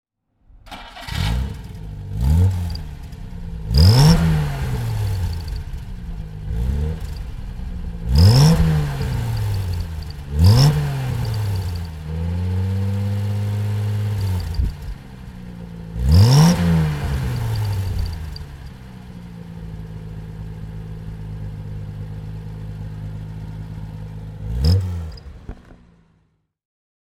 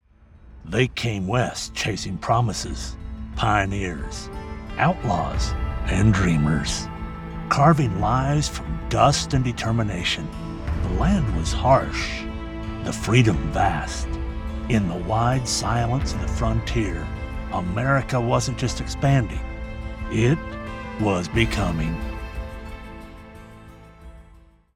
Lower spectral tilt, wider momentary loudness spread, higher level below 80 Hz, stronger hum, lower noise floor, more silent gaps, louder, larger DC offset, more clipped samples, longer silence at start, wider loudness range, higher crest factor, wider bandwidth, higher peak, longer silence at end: about the same, -6.5 dB/octave vs -5.5 dB/octave; first, 22 LU vs 15 LU; about the same, -28 dBFS vs -32 dBFS; neither; first, -64 dBFS vs -51 dBFS; neither; first, -20 LUFS vs -23 LUFS; neither; neither; first, 0.65 s vs 0.35 s; first, 14 LU vs 4 LU; about the same, 20 dB vs 20 dB; first, 15.5 kHz vs 13.5 kHz; first, 0 dBFS vs -4 dBFS; first, 1.3 s vs 0.4 s